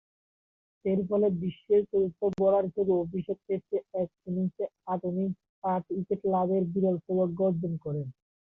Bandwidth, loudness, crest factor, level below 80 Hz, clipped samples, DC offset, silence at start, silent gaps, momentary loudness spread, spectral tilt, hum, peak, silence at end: 3.8 kHz; -29 LUFS; 14 dB; -66 dBFS; under 0.1%; under 0.1%; 0.85 s; 5.49-5.62 s; 9 LU; -11.5 dB/octave; none; -14 dBFS; 0.35 s